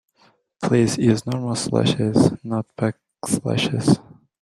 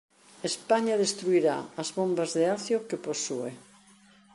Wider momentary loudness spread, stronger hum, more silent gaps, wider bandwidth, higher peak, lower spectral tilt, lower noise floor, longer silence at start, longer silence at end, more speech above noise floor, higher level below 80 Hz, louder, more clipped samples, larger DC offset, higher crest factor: about the same, 8 LU vs 9 LU; neither; neither; first, 13.5 kHz vs 11.5 kHz; first, -2 dBFS vs -10 dBFS; first, -6 dB/octave vs -4 dB/octave; about the same, -59 dBFS vs -58 dBFS; first, 0.6 s vs 0.4 s; second, 0.4 s vs 0.75 s; first, 40 dB vs 30 dB; first, -54 dBFS vs -76 dBFS; first, -21 LUFS vs -28 LUFS; neither; neither; about the same, 18 dB vs 18 dB